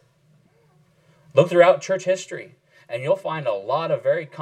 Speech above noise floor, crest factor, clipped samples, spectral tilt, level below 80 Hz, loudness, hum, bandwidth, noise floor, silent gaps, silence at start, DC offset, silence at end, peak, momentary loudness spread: 39 dB; 20 dB; under 0.1%; -5.5 dB/octave; -78 dBFS; -21 LUFS; none; 9.4 kHz; -59 dBFS; none; 1.35 s; under 0.1%; 0 s; -2 dBFS; 15 LU